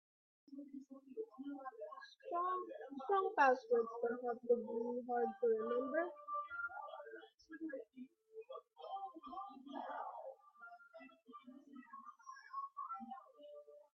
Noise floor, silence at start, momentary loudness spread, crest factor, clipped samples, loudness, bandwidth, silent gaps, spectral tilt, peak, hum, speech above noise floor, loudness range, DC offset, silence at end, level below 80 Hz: -61 dBFS; 0.5 s; 21 LU; 22 dB; under 0.1%; -42 LUFS; 6.2 kHz; none; -2.5 dB/octave; -20 dBFS; none; 22 dB; 15 LU; under 0.1%; 0.1 s; under -90 dBFS